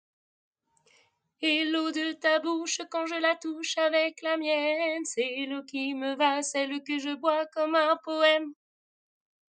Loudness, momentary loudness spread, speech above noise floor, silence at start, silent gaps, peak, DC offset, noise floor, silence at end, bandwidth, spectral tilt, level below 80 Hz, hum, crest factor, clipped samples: -28 LUFS; 7 LU; 39 dB; 1.4 s; none; -10 dBFS; under 0.1%; -67 dBFS; 1.05 s; 9.6 kHz; -0.5 dB/octave; under -90 dBFS; none; 20 dB; under 0.1%